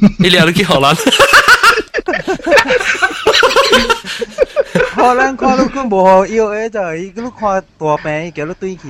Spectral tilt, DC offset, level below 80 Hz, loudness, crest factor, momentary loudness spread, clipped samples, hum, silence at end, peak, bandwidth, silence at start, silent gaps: -4 dB/octave; under 0.1%; -38 dBFS; -11 LUFS; 12 dB; 13 LU; 0.7%; none; 0 s; 0 dBFS; 19.5 kHz; 0 s; none